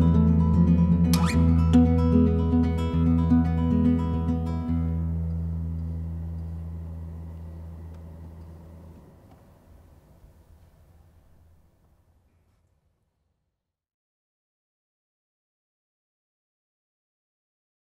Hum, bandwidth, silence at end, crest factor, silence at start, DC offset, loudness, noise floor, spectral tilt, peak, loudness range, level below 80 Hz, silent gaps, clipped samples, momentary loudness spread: none; 12.5 kHz; 9 s; 18 dB; 0 s; under 0.1%; -23 LUFS; -82 dBFS; -8.5 dB/octave; -8 dBFS; 22 LU; -34 dBFS; none; under 0.1%; 21 LU